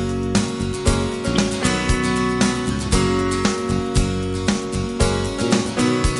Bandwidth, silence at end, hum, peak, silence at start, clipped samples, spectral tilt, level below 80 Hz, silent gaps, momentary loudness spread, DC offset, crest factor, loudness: 11.5 kHz; 0 s; none; -4 dBFS; 0 s; under 0.1%; -5 dB/octave; -28 dBFS; none; 3 LU; under 0.1%; 16 dB; -20 LUFS